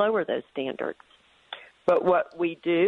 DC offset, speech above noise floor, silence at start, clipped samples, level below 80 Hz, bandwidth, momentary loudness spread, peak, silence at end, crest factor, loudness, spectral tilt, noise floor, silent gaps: under 0.1%; 20 dB; 0 s; under 0.1%; -70 dBFS; 5.8 kHz; 20 LU; -10 dBFS; 0 s; 16 dB; -27 LUFS; -7.5 dB/octave; -45 dBFS; none